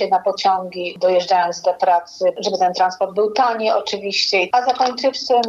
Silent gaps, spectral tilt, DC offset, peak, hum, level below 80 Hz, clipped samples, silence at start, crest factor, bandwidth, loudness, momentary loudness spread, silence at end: none; -3 dB/octave; under 0.1%; -4 dBFS; none; -66 dBFS; under 0.1%; 0 s; 14 dB; 7.8 kHz; -18 LUFS; 4 LU; 0 s